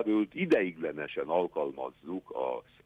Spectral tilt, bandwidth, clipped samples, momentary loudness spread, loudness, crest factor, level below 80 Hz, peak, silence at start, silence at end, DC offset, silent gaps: -7.5 dB/octave; 6.8 kHz; under 0.1%; 11 LU; -32 LUFS; 18 dB; -72 dBFS; -14 dBFS; 0 s; 0.25 s; under 0.1%; none